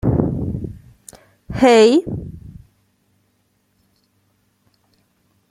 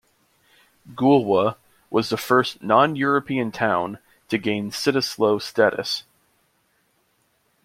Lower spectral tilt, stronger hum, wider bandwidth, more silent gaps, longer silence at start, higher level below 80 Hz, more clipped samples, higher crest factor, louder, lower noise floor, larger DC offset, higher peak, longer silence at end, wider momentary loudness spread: about the same, -6 dB/octave vs -5 dB/octave; neither; second, 13 kHz vs 16.5 kHz; neither; second, 0.05 s vs 0.85 s; first, -42 dBFS vs -64 dBFS; neither; about the same, 20 dB vs 20 dB; first, -16 LUFS vs -21 LUFS; about the same, -64 dBFS vs -66 dBFS; neither; about the same, 0 dBFS vs -2 dBFS; first, 3 s vs 1.65 s; first, 25 LU vs 9 LU